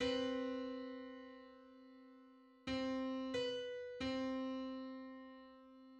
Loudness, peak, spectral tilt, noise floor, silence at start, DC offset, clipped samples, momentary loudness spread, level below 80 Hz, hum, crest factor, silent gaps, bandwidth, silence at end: -44 LUFS; -28 dBFS; -5 dB/octave; -64 dBFS; 0 s; under 0.1%; under 0.1%; 20 LU; -70 dBFS; none; 16 dB; none; 9 kHz; 0 s